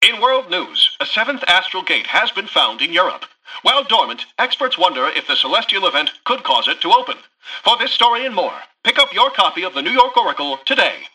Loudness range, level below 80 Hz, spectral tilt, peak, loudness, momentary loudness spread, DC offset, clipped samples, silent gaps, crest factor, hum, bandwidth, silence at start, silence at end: 1 LU; -64 dBFS; -1 dB/octave; 0 dBFS; -15 LUFS; 7 LU; under 0.1%; under 0.1%; none; 16 dB; none; 13.5 kHz; 0 s; 0.05 s